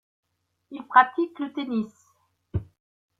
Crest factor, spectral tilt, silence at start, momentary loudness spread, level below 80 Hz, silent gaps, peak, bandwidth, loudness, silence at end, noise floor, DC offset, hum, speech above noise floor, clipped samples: 26 dB; -7.5 dB/octave; 0.7 s; 19 LU; -54 dBFS; none; -2 dBFS; 7.6 kHz; -24 LUFS; 0.55 s; -68 dBFS; under 0.1%; none; 44 dB; under 0.1%